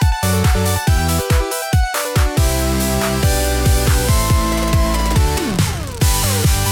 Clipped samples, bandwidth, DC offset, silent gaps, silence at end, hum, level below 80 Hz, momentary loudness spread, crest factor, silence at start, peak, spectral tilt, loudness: under 0.1%; 18 kHz; under 0.1%; none; 0 s; none; -20 dBFS; 3 LU; 12 dB; 0 s; -4 dBFS; -4.5 dB/octave; -16 LUFS